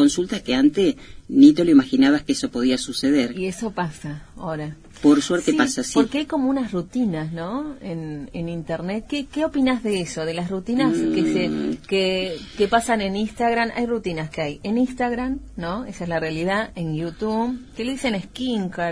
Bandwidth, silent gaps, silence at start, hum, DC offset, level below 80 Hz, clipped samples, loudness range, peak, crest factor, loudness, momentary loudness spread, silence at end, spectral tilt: 11 kHz; none; 0 s; none; under 0.1%; -46 dBFS; under 0.1%; 7 LU; -2 dBFS; 20 dB; -22 LUFS; 12 LU; 0 s; -5 dB/octave